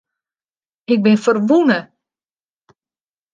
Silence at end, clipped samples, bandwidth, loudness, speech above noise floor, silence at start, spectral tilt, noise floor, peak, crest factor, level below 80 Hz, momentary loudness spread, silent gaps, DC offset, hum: 1.5 s; under 0.1%; 9 kHz; -15 LUFS; over 76 dB; 0.9 s; -6.5 dB/octave; under -90 dBFS; -2 dBFS; 16 dB; -68 dBFS; 7 LU; none; under 0.1%; none